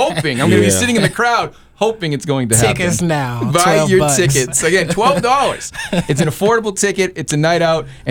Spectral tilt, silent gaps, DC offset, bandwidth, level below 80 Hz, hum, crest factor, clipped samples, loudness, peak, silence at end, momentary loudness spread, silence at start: -4 dB/octave; none; under 0.1%; over 20 kHz; -40 dBFS; none; 14 dB; under 0.1%; -14 LUFS; 0 dBFS; 0 s; 7 LU; 0 s